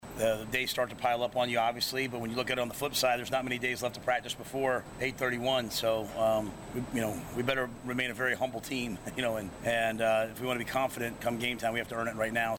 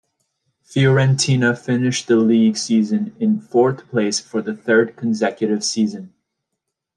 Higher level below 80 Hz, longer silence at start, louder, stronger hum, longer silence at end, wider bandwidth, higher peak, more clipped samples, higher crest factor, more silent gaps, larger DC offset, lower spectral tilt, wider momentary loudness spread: first, -58 dBFS vs -64 dBFS; second, 0 s vs 0.75 s; second, -32 LUFS vs -18 LUFS; neither; second, 0 s vs 0.9 s; first, 18 kHz vs 11 kHz; second, -14 dBFS vs -4 dBFS; neither; about the same, 18 dB vs 16 dB; neither; neither; second, -4 dB/octave vs -5.5 dB/octave; about the same, 6 LU vs 7 LU